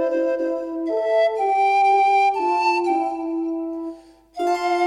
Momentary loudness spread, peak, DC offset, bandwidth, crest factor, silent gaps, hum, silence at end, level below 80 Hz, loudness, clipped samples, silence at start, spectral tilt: 11 LU; -8 dBFS; under 0.1%; 11 kHz; 12 dB; none; none; 0 s; -62 dBFS; -20 LUFS; under 0.1%; 0 s; -3 dB/octave